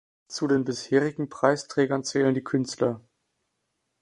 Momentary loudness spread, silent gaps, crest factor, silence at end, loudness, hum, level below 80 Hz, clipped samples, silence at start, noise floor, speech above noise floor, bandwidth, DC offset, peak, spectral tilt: 6 LU; none; 22 dB; 1 s; -26 LUFS; none; -68 dBFS; under 0.1%; 0.3 s; -78 dBFS; 53 dB; 11 kHz; under 0.1%; -4 dBFS; -5.5 dB/octave